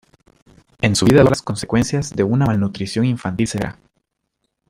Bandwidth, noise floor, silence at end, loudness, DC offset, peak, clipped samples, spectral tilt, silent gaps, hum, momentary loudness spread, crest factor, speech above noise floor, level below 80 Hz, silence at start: 15.5 kHz; -73 dBFS; 1 s; -18 LUFS; under 0.1%; -2 dBFS; under 0.1%; -6 dB/octave; none; none; 9 LU; 18 dB; 57 dB; -44 dBFS; 0.8 s